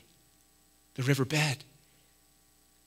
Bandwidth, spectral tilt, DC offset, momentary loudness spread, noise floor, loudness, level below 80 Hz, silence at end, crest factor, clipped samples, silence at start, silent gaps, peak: 16 kHz; -5 dB/octave; under 0.1%; 13 LU; -65 dBFS; -30 LUFS; -74 dBFS; 1.25 s; 24 dB; under 0.1%; 1 s; none; -10 dBFS